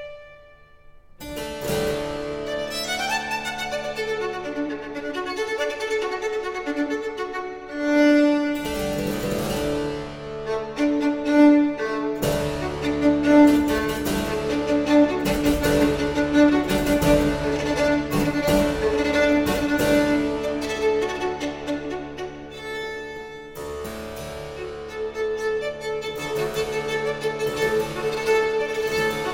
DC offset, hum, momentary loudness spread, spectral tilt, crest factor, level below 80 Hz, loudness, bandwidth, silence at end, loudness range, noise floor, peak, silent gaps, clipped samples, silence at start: under 0.1%; none; 14 LU; -5 dB/octave; 20 dB; -42 dBFS; -23 LUFS; 16.5 kHz; 0 s; 9 LU; -49 dBFS; -4 dBFS; none; under 0.1%; 0 s